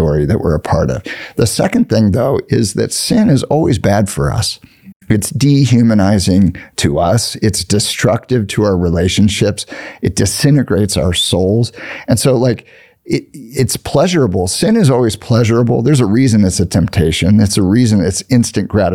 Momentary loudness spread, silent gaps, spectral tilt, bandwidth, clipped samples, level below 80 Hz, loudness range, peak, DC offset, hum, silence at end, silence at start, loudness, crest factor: 7 LU; 4.96-5.00 s; -5.5 dB/octave; 16 kHz; under 0.1%; -36 dBFS; 3 LU; 0 dBFS; 0.2%; none; 0 s; 0 s; -13 LUFS; 12 dB